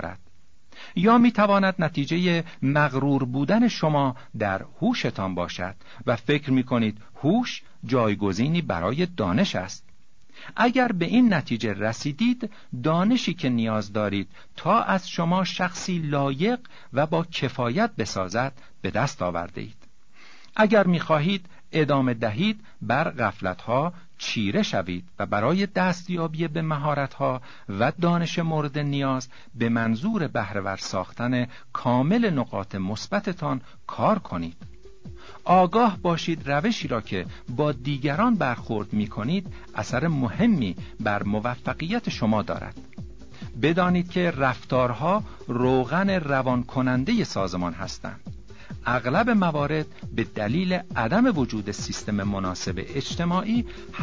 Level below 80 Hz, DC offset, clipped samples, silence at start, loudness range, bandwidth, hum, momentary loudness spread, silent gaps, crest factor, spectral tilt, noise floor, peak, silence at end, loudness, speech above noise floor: -50 dBFS; 0.7%; under 0.1%; 0 s; 3 LU; 7.6 kHz; none; 11 LU; none; 18 dB; -6.5 dB/octave; -60 dBFS; -8 dBFS; 0 s; -25 LUFS; 36 dB